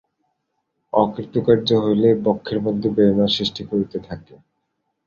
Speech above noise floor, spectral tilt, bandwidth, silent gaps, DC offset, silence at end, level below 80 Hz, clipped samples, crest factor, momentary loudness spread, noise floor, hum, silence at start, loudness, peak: 55 dB; -7 dB/octave; 7.2 kHz; none; under 0.1%; 0.85 s; -52 dBFS; under 0.1%; 18 dB; 9 LU; -74 dBFS; none; 0.95 s; -19 LUFS; -2 dBFS